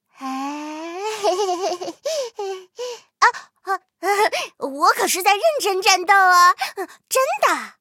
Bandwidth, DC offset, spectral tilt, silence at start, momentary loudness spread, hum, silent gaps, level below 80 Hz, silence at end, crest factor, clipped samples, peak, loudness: 16.5 kHz; under 0.1%; 0.5 dB/octave; 0.2 s; 17 LU; none; none; -82 dBFS; 0.1 s; 18 dB; under 0.1%; -2 dBFS; -19 LUFS